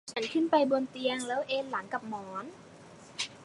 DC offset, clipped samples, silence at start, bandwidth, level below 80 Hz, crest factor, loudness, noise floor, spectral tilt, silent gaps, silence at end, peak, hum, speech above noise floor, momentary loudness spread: under 0.1%; under 0.1%; 0.05 s; 11.5 kHz; -76 dBFS; 20 dB; -32 LUFS; -52 dBFS; -3.5 dB/octave; none; 0 s; -12 dBFS; none; 21 dB; 20 LU